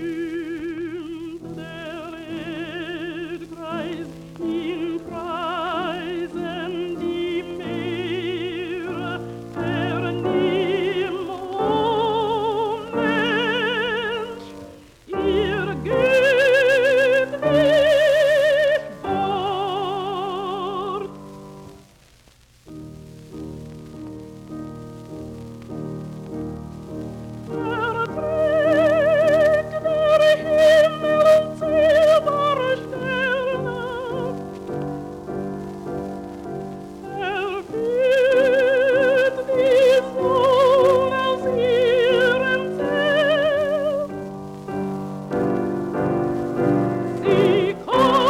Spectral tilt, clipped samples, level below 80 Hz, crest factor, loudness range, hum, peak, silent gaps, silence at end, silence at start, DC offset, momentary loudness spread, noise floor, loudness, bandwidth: -5.5 dB/octave; under 0.1%; -50 dBFS; 16 dB; 15 LU; none; -6 dBFS; none; 0 s; 0 s; under 0.1%; 18 LU; -53 dBFS; -20 LUFS; 15.5 kHz